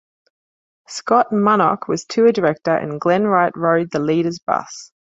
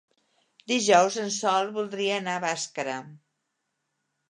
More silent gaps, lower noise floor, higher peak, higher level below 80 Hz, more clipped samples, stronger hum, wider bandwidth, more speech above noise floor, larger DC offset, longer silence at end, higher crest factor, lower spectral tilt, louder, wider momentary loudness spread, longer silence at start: first, 4.43-4.47 s vs none; first, under -90 dBFS vs -79 dBFS; first, -2 dBFS vs -6 dBFS; first, -62 dBFS vs -82 dBFS; neither; neither; second, 8 kHz vs 11 kHz; first, over 73 dB vs 54 dB; neither; second, 0.2 s vs 1.15 s; second, 16 dB vs 22 dB; first, -6 dB/octave vs -2.5 dB/octave; first, -17 LUFS vs -25 LUFS; second, 8 LU vs 11 LU; first, 0.9 s vs 0.7 s